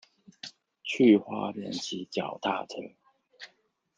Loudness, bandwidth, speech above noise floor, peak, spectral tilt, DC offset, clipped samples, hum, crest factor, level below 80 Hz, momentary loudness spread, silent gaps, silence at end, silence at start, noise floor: -28 LUFS; 7.8 kHz; 42 dB; -10 dBFS; -5 dB/octave; under 0.1%; under 0.1%; none; 22 dB; -80 dBFS; 27 LU; none; 0.5 s; 0.45 s; -70 dBFS